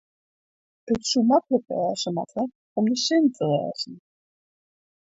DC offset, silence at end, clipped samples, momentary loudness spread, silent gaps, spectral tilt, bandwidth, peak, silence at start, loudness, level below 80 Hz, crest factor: under 0.1%; 1.05 s; under 0.1%; 10 LU; 2.55-2.76 s; -4.5 dB/octave; 8 kHz; -8 dBFS; 0.85 s; -24 LUFS; -64 dBFS; 18 dB